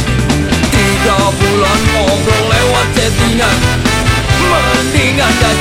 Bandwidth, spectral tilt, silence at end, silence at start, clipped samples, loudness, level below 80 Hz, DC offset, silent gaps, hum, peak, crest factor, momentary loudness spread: 16.5 kHz; -4.5 dB/octave; 0 s; 0 s; under 0.1%; -10 LUFS; -20 dBFS; under 0.1%; none; none; 0 dBFS; 10 dB; 2 LU